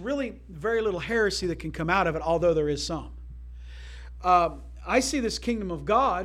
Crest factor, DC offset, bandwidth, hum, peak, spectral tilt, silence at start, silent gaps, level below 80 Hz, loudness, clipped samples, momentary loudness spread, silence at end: 18 dB; under 0.1%; 15.5 kHz; 60 Hz at -40 dBFS; -8 dBFS; -4.5 dB/octave; 0 s; none; -42 dBFS; -26 LUFS; under 0.1%; 20 LU; 0 s